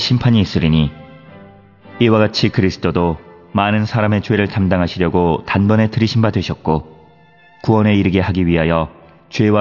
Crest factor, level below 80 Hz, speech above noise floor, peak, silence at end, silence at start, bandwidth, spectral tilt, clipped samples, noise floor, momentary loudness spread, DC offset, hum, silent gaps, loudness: 14 dB; -40 dBFS; 33 dB; -2 dBFS; 0 s; 0 s; 6 kHz; -7.5 dB/octave; under 0.1%; -47 dBFS; 7 LU; 0.2%; none; none; -16 LUFS